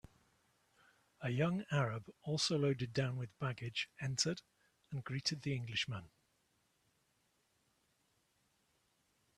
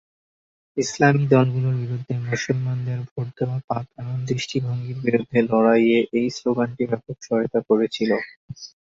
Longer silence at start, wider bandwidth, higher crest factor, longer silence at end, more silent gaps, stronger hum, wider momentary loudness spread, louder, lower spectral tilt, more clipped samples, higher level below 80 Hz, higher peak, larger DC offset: first, 1.2 s vs 0.75 s; first, 12.5 kHz vs 7.8 kHz; about the same, 22 dB vs 20 dB; first, 3.3 s vs 0.3 s; second, none vs 3.11-3.16 s, 3.64-3.68 s, 8.36-8.48 s; neither; about the same, 10 LU vs 12 LU; second, -39 LUFS vs -22 LUFS; second, -4.5 dB/octave vs -6.5 dB/octave; neither; second, -74 dBFS vs -60 dBFS; second, -20 dBFS vs -2 dBFS; neither